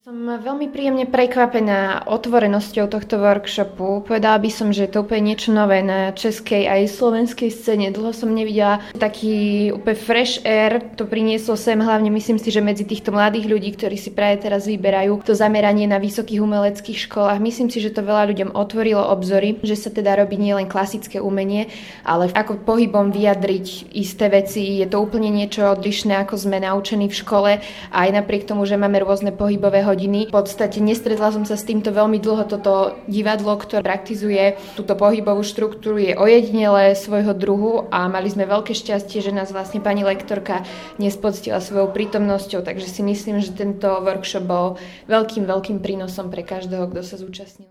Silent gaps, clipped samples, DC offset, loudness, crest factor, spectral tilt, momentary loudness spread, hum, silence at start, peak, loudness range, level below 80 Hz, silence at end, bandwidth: none; under 0.1%; under 0.1%; -19 LUFS; 18 dB; -5.5 dB/octave; 8 LU; none; 0.05 s; 0 dBFS; 5 LU; -52 dBFS; 0.05 s; 15 kHz